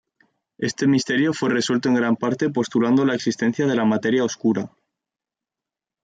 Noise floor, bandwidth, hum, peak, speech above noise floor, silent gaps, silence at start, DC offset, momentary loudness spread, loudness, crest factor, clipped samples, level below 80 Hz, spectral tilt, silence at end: -88 dBFS; 9.2 kHz; none; -8 dBFS; 68 dB; none; 0.6 s; under 0.1%; 4 LU; -21 LUFS; 14 dB; under 0.1%; -66 dBFS; -5.5 dB/octave; 1.35 s